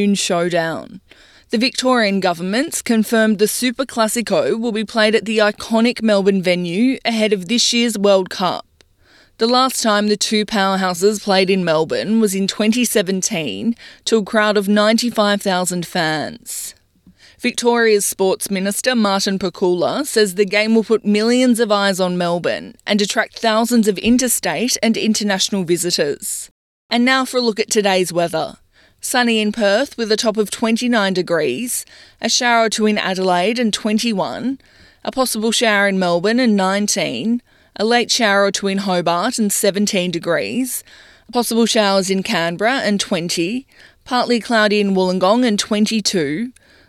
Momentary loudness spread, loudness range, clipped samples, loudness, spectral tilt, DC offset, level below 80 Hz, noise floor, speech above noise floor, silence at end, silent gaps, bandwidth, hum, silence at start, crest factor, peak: 7 LU; 2 LU; under 0.1%; -17 LUFS; -3.5 dB/octave; under 0.1%; -56 dBFS; -52 dBFS; 36 dB; 0.4 s; 26.51-26.89 s; 15.5 kHz; none; 0 s; 14 dB; -2 dBFS